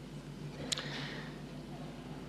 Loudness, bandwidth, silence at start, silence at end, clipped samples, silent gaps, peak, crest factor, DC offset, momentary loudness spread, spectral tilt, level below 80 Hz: -42 LUFS; 15 kHz; 0 s; 0 s; under 0.1%; none; -16 dBFS; 28 dB; under 0.1%; 9 LU; -3.5 dB/octave; -60 dBFS